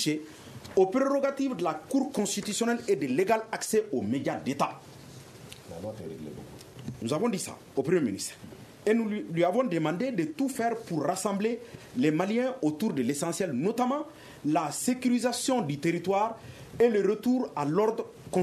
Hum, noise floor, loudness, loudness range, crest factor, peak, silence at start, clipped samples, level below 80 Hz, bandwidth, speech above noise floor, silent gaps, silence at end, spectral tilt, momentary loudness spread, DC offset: none; -48 dBFS; -29 LUFS; 5 LU; 18 dB; -12 dBFS; 0 s; under 0.1%; -64 dBFS; 14 kHz; 19 dB; none; 0 s; -5 dB/octave; 16 LU; under 0.1%